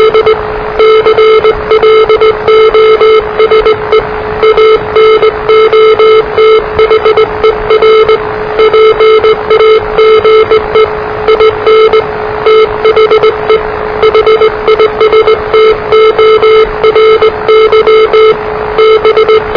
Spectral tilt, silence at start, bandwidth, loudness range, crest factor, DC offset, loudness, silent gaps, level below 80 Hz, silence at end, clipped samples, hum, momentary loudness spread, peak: -5.5 dB/octave; 0 s; 5.4 kHz; 1 LU; 4 dB; 0.4%; -5 LUFS; none; -30 dBFS; 0 s; 1%; none; 5 LU; 0 dBFS